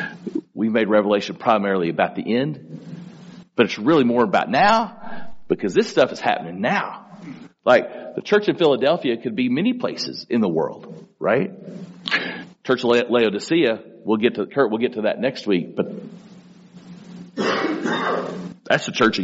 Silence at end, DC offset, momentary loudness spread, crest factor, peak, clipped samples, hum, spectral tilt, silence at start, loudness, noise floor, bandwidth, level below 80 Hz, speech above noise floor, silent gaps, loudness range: 0 s; under 0.1%; 19 LU; 20 dB; -2 dBFS; under 0.1%; none; -3.5 dB/octave; 0 s; -21 LUFS; -45 dBFS; 8 kHz; -64 dBFS; 26 dB; none; 5 LU